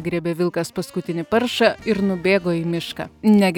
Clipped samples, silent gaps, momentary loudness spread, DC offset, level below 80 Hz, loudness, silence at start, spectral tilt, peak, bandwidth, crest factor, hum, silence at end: under 0.1%; none; 9 LU; under 0.1%; -52 dBFS; -21 LUFS; 0 s; -6 dB/octave; -4 dBFS; 18 kHz; 16 dB; none; 0 s